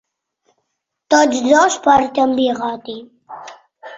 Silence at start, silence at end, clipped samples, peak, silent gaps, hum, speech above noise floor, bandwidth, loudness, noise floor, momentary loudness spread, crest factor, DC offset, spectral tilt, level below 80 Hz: 1.1 s; 0 s; under 0.1%; 0 dBFS; none; none; 60 dB; 8 kHz; -14 LUFS; -75 dBFS; 22 LU; 16 dB; under 0.1%; -2.5 dB/octave; -54 dBFS